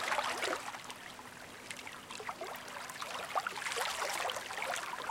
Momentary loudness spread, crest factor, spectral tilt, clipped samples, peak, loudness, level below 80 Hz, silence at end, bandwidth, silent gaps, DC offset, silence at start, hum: 11 LU; 20 dB; -1 dB/octave; under 0.1%; -20 dBFS; -39 LUFS; -74 dBFS; 0 s; 17 kHz; none; under 0.1%; 0 s; none